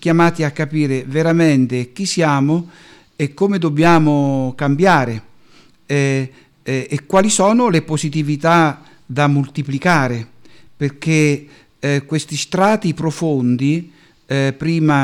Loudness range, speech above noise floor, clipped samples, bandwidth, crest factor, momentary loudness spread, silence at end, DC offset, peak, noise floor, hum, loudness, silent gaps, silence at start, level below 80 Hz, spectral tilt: 3 LU; 35 dB; under 0.1%; 13 kHz; 14 dB; 11 LU; 0 s; under 0.1%; -2 dBFS; -50 dBFS; none; -16 LUFS; none; 0 s; -52 dBFS; -6 dB/octave